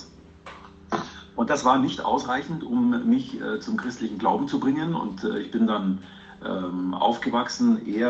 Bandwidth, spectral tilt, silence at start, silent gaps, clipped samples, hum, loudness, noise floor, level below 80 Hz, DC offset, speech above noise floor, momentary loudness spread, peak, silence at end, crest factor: 8 kHz; -5.5 dB/octave; 0 s; none; under 0.1%; none; -25 LUFS; -46 dBFS; -60 dBFS; under 0.1%; 21 dB; 11 LU; -6 dBFS; 0 s; 20 dB